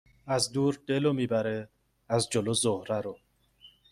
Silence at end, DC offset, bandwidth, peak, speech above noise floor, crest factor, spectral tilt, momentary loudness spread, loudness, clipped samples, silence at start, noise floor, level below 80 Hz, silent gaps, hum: 0.25 s; under 0.1%; 15 kHz; -10 dBFS; 31 dB; 20 dB; -4.5 dB/octave; 7 LU; -29 LUFS; under 0.1%; 0.25 s; -59 dBFS; -64 dBFS; none; none